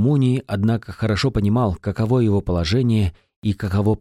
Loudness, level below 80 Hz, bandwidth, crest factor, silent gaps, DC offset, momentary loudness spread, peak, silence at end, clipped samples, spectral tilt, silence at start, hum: -20 LUFS; -38 dBFS; 12 kHz; 12 dB; 3.36-3.42 s; under 0.1%; 6 LU; -8 dBFS; 0.05 s; under 0.1%; -7.5 dB/octave; 0 s; none